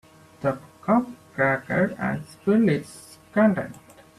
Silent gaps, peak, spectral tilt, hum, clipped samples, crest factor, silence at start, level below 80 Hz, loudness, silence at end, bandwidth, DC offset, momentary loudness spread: none; -8 dBFS; -7.5 dB/octave; none; under 0.1%; 18 dB; 0.4 s; -60 dBFS; -24 LUFS; 0.4 s; 13 kHz; under 0.1%; 13 LU